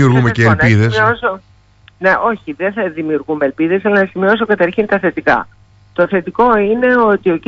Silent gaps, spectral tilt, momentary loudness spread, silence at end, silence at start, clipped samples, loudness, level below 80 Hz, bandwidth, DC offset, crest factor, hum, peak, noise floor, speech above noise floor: none; -7.5 dB/octave; 8 LU; 0.1 s; 0 s; under 0.1%; -13 LUFS; -44 dBFS; 8 kHz; under 0.1%; 14 dB; 50 Hz at -45 dBFS; 0 dBFS; -46 dBFS; 34 dB